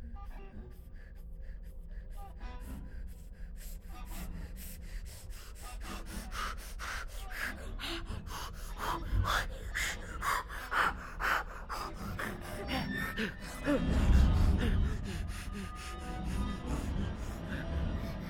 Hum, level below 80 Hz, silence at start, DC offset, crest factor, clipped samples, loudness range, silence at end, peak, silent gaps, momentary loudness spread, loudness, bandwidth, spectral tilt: none; -38 dBFS; 0 s; under 0.1%; 20 dB; under 0.1%; 15 LU; 0 s; -14 dBFS; none; 18 LU; -36 LUFS; 17.5 kHz; -5 dB/octave